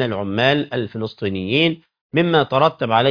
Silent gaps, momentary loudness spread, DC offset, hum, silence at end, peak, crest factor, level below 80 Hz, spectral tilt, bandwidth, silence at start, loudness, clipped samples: 2.01-2.10 s; 8 LU; under 0.1%; none; 0 s; 0 dBFS; 18 dB; -56 dBFS; -7.5 dB/octave; 5.2 kHz; 0 s; -19 LUFS; under 0.1%